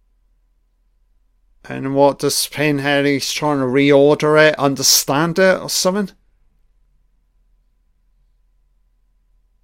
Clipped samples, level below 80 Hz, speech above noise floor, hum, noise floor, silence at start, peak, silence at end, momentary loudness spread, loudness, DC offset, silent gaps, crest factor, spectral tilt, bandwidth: under 0.1%; -54 dBFS; 45 dB; none; -60 dBFS; 1.65 s; 0 dBFS; 3.55 s; 8 LU; -15 LUFS; under 0.1%; none; 18 dB; -3.5 dB/octave; 16.5 kHz